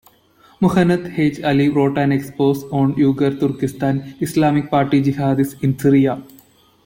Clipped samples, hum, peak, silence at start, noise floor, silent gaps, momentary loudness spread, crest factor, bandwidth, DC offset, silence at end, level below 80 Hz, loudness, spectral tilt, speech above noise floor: under 0.1%; none; -4 dBFS; 0.6 s; -52 dBFS; none; 6 LU; 14 dB; 16.5 kHz; under 0.1%; 0.6 s; -52 dBFS; -17 LUFS; -7.5 dB/octave; 35 dB